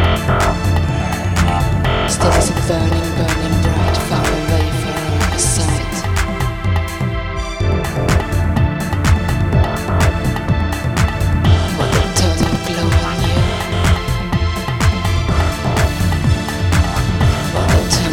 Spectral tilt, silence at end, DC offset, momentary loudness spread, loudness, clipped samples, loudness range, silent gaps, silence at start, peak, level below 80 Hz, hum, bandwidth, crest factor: -5 dB/octave; 0 s; under 0.1%; 4 LU; -16 LUFS; under 0.1%; 2 LU; none; 0 s; 0 dBFS; -22 dBFS; none; 16.5 kHz; 14 dB